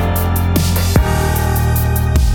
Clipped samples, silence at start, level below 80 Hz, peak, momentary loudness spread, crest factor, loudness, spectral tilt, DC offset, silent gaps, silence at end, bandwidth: under 0.1%; 0 s; -18 dBFS; 0 dBFS; 2 LU; 14 dB; -15 LUFS; -5.5 dB/octave; under 0.1%; none; 0 s; over 20 kHz